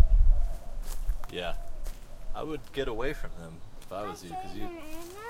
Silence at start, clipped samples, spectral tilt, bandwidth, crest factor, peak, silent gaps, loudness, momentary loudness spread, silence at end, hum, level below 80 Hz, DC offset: 0 s; under 0.1%; -5.5 dB/octave; 14 kHz; 20 dB; -6 dBFS; none; -36 LUFS; 15 LU; 0 s; none; -30 dBFS; under 0.1%